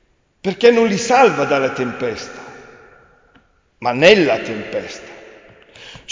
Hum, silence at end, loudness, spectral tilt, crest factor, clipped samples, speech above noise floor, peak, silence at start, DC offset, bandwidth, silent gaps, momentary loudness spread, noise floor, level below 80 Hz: none; 0 s; -15 LUFS; -4.5 dB/octave; 18 dB; under 0.1%; 40 dB; 0 dBFS; 0.45 s; under 0.1%; 7.6 kHz; none; 23 LU; -55 dBFS; -54 dBFS